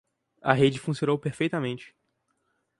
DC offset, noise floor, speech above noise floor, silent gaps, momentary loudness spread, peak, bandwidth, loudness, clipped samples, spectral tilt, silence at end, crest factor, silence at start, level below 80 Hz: under 0.1%; -75 dBFS; 49 dB; none; 11 LU; -2 dBFS; 11.5 kHz; -26 LUFS; under 0.1%; -6.5 dB/octave; 0.95 s; 26 dB; 0.45 s; -66 dBFS